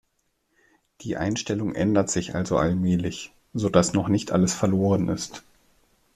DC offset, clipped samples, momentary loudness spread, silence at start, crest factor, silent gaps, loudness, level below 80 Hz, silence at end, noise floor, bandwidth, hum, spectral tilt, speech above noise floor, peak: under 0.1%; under 0.1%; 12 LU; 1 s; 22 dB; none; -24 LUFS; -52 dBFS; 0.75 s; -72 dBFS; 13 kHz; none; -5.5 dB/octave; 49 dB; -2 dBFS